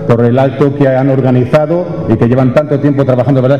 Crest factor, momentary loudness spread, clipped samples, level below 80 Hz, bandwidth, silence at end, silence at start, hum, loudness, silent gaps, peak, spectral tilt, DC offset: 8 dB; 3 LU; under 0.1%; -38 dBFS; 6.8 kHz; 0 s; 0 s; none; -10 LUFS; none; 0 dBFS; -9.5 dB/octave; 1%